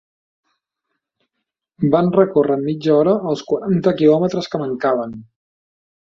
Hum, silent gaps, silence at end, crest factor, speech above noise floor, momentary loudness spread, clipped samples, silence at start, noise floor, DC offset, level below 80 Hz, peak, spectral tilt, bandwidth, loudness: none; none; 0.8 s; 18 dB; 62 dB; 8 LU; under 0.1%; 1.8 s; -79 dBFS; under 0.1%; -58 dBFS; -2 dBFS; -8 dB/octave; 7.4 kHz; -17 LUFS